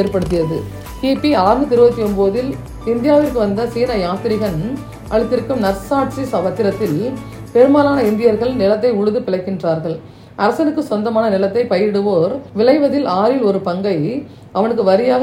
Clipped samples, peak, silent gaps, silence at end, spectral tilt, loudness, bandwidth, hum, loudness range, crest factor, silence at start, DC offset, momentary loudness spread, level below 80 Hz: under 0.1%; 0 dBFS; none; 0 s; -7.5 dB/octave; -16 LUFS; 16.5 kHz; none; 3 LU; 16 dB; 0 s; under 0.1%; 9 LU; -38 dBFS